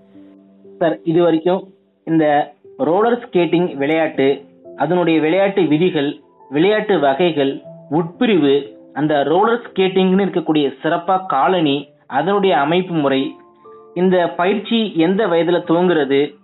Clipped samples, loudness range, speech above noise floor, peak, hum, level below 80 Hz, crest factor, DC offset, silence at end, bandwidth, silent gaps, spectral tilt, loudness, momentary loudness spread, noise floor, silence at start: under 0.1%; 1 LU; 28 dB; -4 dBFS; none; -66 dBFS; 12 dB; under 0.1%; 0.1 s; 4.1 kHz; none; -4.5 dB/octave; -16 LUFS; 8 LU; -44 dBFS; 0.15 s